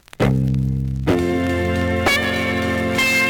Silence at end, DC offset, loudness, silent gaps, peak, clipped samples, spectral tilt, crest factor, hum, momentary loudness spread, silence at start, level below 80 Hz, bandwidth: 0 s; under 0.1%; -19 LUFS; none; -4 dBFS; under 0.1%; -5.5 dB/octave; 14 dB; none; 3 LU; 0.2 s; -34 dBFS; 19.5 kHz